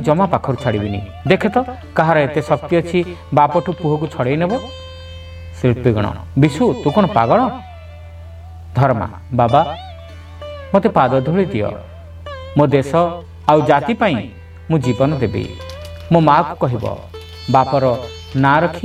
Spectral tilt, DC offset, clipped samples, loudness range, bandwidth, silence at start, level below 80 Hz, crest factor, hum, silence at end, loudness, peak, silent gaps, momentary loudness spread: -7.5 dB/octave; under 0.1%; under 0.1%; 2 LU; 12.5 kHz; 0 s; -40 dBFS; 16 dB; none; 0 s; -16 LUFS; 0 dBFS; none; 20 LU